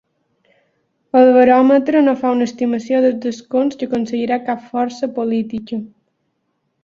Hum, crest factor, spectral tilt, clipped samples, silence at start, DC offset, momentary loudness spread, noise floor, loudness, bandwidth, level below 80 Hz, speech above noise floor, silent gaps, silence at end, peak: none; 14 dB; -6 dB/octave; under 0.1%; 1.15 s; under 0.1%; 12 LU; -69 dBFS; -16 LUFS; 7.2 kHz; -60 dBFS; 54 dB; none; 0.95 s; -2 dBFS